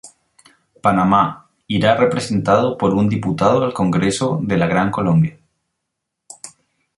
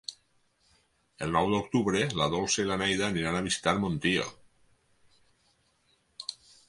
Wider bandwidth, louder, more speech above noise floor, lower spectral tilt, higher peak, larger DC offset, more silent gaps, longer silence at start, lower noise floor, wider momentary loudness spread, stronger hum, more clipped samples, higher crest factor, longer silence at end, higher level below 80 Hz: about the same, 11.5 kHz vs 11.5 kHz; first, -17 LUFS vs -29 LUFS; first, 62 dB vs 42 dB; first, -6.5 dB/octave vs -4 dB/octave; first, -2 dBFS vs -10 dBFS; neither; neither; about the same, 0.05 s vs 0.1 s; first, -78 dBFS vs -70 dBFS; second, 8 LU vs 13 LU; neither; neither; second, 16 dB vs 22 dB; first, 0.5 s vs 0.35 s; first, -48 dBFS vs -56 dBFS